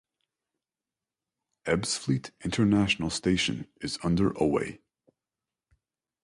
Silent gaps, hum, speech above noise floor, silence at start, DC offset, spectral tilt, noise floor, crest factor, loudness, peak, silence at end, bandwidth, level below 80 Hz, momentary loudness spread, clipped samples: none; none; over 63 dB; 1.65 s; under 0.1%; -5 dB/octave; under -90 dBFS; 18 dB; -28 LUFS; -12 dBFS; 1.5 s; 11.5 kHz; -52 dBFS; 10 LU; under 0.1%